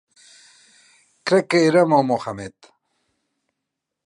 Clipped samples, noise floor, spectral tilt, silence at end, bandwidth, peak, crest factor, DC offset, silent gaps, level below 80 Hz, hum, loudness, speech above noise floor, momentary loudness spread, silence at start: under 0.1%; -81 dBFS; -5.5 dB/octave; 1.55 s; 11.5 kHz; -4 dBFS; 20 dB; under 0.1%; none; -64 dBFS; none; -18 LUFS; 63 dB; 17 LU; 1.25 s